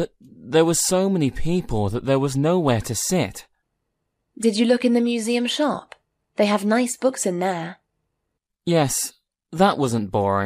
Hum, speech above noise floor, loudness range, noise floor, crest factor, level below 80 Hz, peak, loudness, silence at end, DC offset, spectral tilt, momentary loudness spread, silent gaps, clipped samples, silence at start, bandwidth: none; 58 dB; 3 LU; -79 dBFS; 18 dB; -44 dBFS; -4 dBFS; -21 LUFS; 0 s; under 0.1%; -5 dB/octave; 11 LU; none; under 0.1%; 0 s; 15.5 kHz